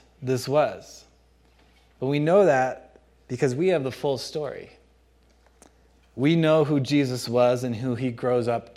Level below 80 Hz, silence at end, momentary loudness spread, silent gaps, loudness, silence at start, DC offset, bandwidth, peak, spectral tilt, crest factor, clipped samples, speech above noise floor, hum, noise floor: -60 dBFS; 0.05 s; 13 LU; none; -24 LUFS; 0.2 s; under 0.1%; 15 kHz; -8 dBFS; -6.5 dB/octave; 18 dB; under 0.1%; 36 dB; none; -59 dBFS